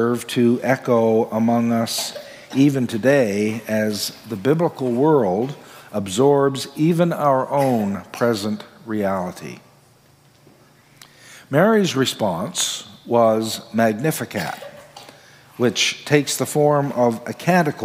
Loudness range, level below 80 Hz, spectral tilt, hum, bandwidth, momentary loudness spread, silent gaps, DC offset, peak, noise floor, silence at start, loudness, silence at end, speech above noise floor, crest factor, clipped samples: 4 LU; -68 dBFS; -5 dB/octave; none; 16 kHz; 11 LU; none; under 0.1%; -2 dBFS; -53 dBFS; 0 s; -20 LUFS; 0 s; 34 dB; 18 dB; under 0.1%